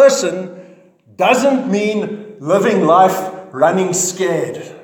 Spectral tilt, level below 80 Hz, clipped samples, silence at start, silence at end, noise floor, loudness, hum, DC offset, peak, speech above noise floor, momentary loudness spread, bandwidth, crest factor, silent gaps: -4 dB/octave; -68 dBFS; under 0.1%; 0 s; 0.05 s; -46 dBFS; -15 LUFS; none; under 0.1%; 0 dBFS; 31 dB; 14 LU; 18 kHz; 14 dB; none